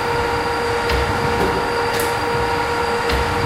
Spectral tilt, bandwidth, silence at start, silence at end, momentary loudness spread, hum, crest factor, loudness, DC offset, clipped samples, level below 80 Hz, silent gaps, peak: -4.5 dB/octave; 16 kHz; 0 s; 0 s; 1 LU; none; 14 dB; -19 LUFS; under 0.1%; under 0.1%; -32 dBFS; none; -4 dBFS